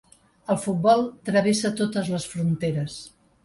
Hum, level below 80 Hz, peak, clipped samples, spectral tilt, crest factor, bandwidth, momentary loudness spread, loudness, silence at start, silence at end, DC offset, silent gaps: none; -60 dBFS; -6 dBFS; under 0.1%; -5.5 dB/octave; 18 dB; 11.5 kHz; 11 LU; -24 LUFS; 0.5 s; 0.35 s; under 0.1%; none